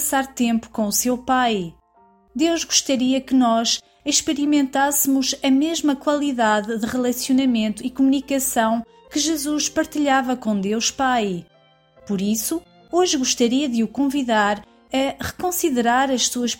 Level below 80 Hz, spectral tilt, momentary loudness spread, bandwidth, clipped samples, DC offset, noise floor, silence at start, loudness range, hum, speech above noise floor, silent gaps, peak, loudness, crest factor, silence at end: -54 dBFS; -3 dB/octave; 7 LU; 17 kHz; under 0.1%; under 0.1%; -55 dBFS; 0 s; 3 LU; none; 36 dB; none; -4 dBFS; -20 LUFS; 16 dB; 0.05 s